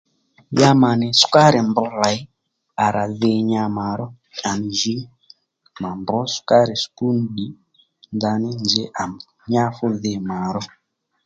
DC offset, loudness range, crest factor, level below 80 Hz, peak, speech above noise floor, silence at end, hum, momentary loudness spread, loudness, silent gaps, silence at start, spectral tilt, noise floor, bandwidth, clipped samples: under 0.1%; 6 LU; 20 dB; -56 dBFS; 0 dBFS; 36 dB; 0.6 s; none; 16 LU; -19 LUFS; none; 0.5 s; -5 dB/octave; -55 dBFS; 9.2 kHz; under 0.1%